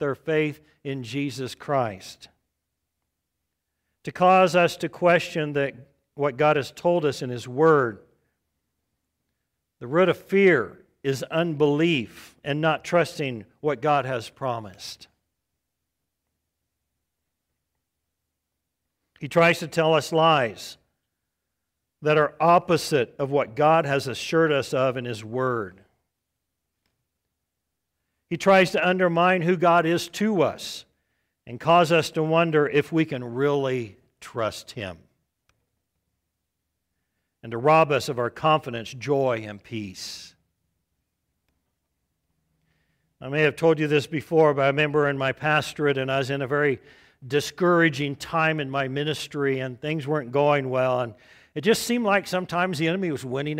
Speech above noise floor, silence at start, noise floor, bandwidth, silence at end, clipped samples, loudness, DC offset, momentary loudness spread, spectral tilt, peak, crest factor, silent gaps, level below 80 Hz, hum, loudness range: 59 dB; 0 s; -82 dBFS; 16 kHz; 0 s; under 0.1%; -23 LUFS; under 0.1%; 15 LU; -5.5 dB/octave; -6 dBFS; 18 dB; none; -64 dBFS; none; 10 LU